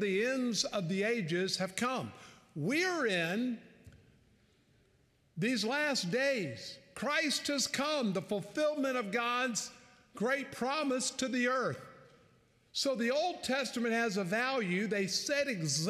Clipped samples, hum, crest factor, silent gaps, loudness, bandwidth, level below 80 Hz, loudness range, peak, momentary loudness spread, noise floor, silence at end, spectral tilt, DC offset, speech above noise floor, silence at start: under 0.1%; none; 20 dB; none; -33 LUFS; 15.5 kHz; -76 dBFS; 3 LU; -14 dBFS; 7 LU; -70 dBFS; 0 s; -3.5 dB/octave; under 0.1%; 36 dB; 0 s